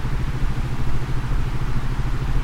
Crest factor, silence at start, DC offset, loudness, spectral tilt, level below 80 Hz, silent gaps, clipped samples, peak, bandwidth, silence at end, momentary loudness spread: 12 dB; 0 s; under 0.1%; -27 LUFS; -6.5 dB/octave; -24 dBFS; none; under 0.1%; -8 dBFS; 9.2 kHz; 0 s; 1 LU